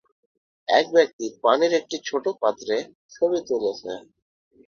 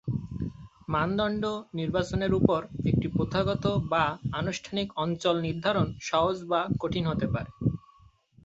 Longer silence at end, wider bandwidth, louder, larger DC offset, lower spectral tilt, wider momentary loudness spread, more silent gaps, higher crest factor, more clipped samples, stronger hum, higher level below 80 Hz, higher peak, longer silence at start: about the same, 0.7 s vs 0.65 s; second, 7 kHz vs 8 kHz; first, -23 LUFS vs -29 LUFS; neither; second, -3 dB/octave vs -6.5 dB/octave; first, 16 LU vs 6 LU; first, 1.13-1.19 s, 2.95-3.09 s vs none; about the same, 22 dB vs 24 dB; neither; neither; second, -70 dBFS vs -48 dBFS; about the same, -4 dBFS vs -4 dBFS; first, 0.7 s vs 0.05 s